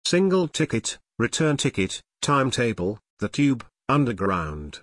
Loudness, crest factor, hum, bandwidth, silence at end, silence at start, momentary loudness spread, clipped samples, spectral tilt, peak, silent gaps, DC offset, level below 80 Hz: -24 LUFS; 16 dB; none; 11 kHz; 0.05 s; 0.05 s; 9 LU; under 0.1%; -5 dB/octave; -8 dBFS; 3.10-3.17 s; under 0.1%; -50 dBFS